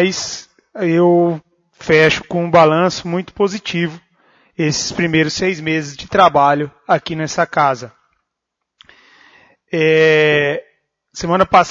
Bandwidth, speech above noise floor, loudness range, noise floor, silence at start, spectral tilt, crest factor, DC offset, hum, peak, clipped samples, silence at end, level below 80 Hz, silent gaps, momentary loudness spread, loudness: 7.8 kHz; 63 dB; 4 LU; -78 dBFS; 0 s; -5 dB/octave; 16 dB; under 0.1%; none; 0 dBFS; under 0.1%; 0 s; -50 dBFS; none; 14 LU; -15 LUFS